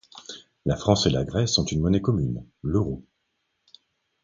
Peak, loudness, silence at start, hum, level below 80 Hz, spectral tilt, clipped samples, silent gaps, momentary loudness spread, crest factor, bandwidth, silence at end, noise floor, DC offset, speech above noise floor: -4 dBFS; -24 LUFS; 0.15 s; none; -42 dBFS; -5.5 dB/octave; under 0.1%; none; 17 LU; 22 dB; 9.2 kHz; 1.2 s; -76 dBFS; under 0.1%; 52 dB